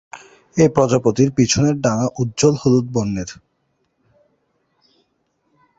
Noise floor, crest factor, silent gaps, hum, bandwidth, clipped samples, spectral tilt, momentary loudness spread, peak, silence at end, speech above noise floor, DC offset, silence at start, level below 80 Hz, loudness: -68 dBFS; 18 dB; none; none; 8 kHz; under 0.1%; -5.5 dB/octave; 10 LU; 0 dBFS; 2.45 s; 51 dB; under 0.1%; 0.15 s; -48 dBFS; -17 LUFS